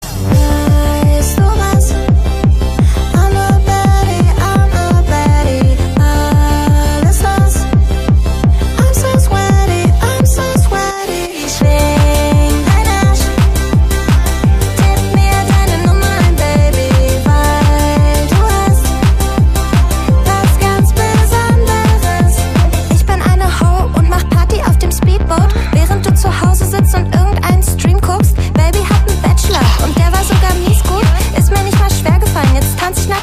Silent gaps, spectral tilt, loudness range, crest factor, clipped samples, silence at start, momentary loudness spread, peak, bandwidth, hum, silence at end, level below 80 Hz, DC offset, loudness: none; -5.5 dB/octave; 1 LU; 10 dB; under 0.1%; 0 s; 2 LU; 0 dBFS; 15.5 kHz; none; 0 s; -12 dBFS; under 0.1%; -11 LUFS